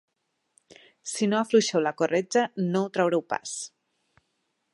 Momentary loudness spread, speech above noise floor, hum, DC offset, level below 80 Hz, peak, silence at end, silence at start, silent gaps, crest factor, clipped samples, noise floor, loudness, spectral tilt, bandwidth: 13 LU; 51 dB; none; under 0.1%; -78 dBFS; -8 dBFS; 1.05 s; 1.05 s; none; 20 dB; under 0.1%; -76 dBFS; -26 LUFS; -4.5 dB/octave; 11.5 kHz